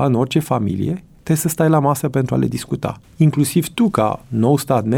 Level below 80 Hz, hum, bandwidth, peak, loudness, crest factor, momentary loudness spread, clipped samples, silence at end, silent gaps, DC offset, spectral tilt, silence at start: -48 dBFS; none; 18 kHz; -2 dBFS; -18 LUFS; 16 dB; 8 LU; under 0.1%; 0 s; none; under 0.1%; -6.5 dB/octave; 0 s